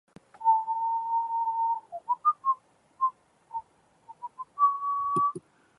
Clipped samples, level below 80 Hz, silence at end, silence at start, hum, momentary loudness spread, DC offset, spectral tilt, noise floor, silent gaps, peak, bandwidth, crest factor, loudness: under 0.1%; -78 dBFS; 0.4 s; 0.4 s; none; 15 LU; under 0.1%; -6.5 dB/octave; -58 dBFS; none; -14 dBFS; 10.5 kHz; 16 dB; -28 LUFS